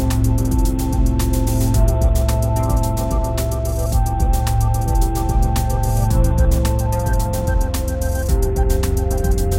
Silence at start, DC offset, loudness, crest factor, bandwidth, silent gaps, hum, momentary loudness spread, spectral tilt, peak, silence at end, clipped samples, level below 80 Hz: 0 s; under 0.1%; -19 LUFS; 12 dB; 16.5 kHz; none; none; 4 LU; -6.5 dB/octave; -4 dBFS; 0 s; under 0.1%; -18 dBFS